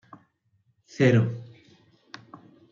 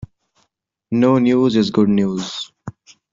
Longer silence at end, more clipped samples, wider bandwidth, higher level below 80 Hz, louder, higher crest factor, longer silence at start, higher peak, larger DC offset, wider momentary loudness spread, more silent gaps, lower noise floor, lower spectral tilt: first, 1.3 s vs 0.45 s; neither; about the same, 7.4 kHz vs 7.6 kHz; second, -72 dBFS vs -54 dBFS; second, -23 LUFS vs -16 LUFS; about the same, 20 dB vs 16 dB; first, 1 s vs 0 s; second, -8 dBFS vs -4 dBFS; neither; first, 26 LU vs 17 LU; neither; about the same, -69 dBFS vs -69 dBFS; about the same, -7.5 dB/octave vs -6.5 dB/octave